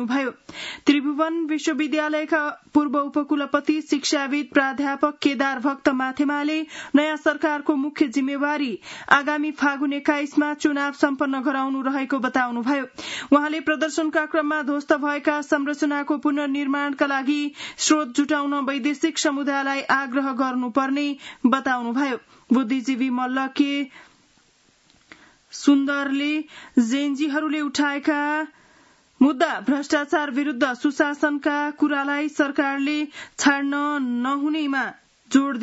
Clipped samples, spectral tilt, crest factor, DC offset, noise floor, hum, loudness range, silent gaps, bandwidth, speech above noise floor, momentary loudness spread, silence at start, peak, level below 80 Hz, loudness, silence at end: under 0.1%; -3 dB/octave; 22 dB; under 0.1%; -60 dBFS; none; 2 LU; none; 8 kHz; 38 dB; 5 LU; 0 s; 0 dBFS; -70 dBFS; -22 LUFS; 0 s